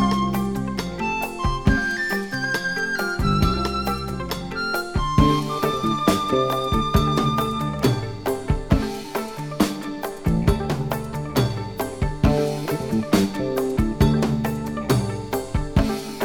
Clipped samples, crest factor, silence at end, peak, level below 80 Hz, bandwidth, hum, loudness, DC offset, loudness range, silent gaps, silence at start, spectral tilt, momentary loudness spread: under 0.1%; 18 dB; 0 s; -4 dBFS; -32 dBFS; 19.5 kHz; none; -23 LUFS; under 0.1%; 3 LU; none; 0 s; -6 dB/octave; 8 LU